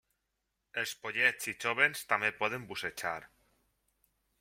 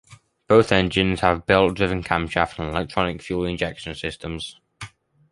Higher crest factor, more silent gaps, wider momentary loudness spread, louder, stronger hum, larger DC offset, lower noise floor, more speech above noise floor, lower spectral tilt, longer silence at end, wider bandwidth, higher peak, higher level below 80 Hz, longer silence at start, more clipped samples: about the same, 24 dB vs 20 dB; neither; second, 10 LU vs 16 LU; second, -32 LUFS vs -22 LUFS; neither; neither; first, -84 dBFS vs -42 dBFS; first, 50 dB vs 21 dB; second, -2 dB/octave vs -6 dB/octave; first, 1.15 s vs 0.45 s; first, 16.5 kHz vs 11.5 kHz; second, -12 dBFS vs -2 dBFS; second, -74 dBFS vs -42 dBFS; first, 0.75 s vs 0.1 s; neither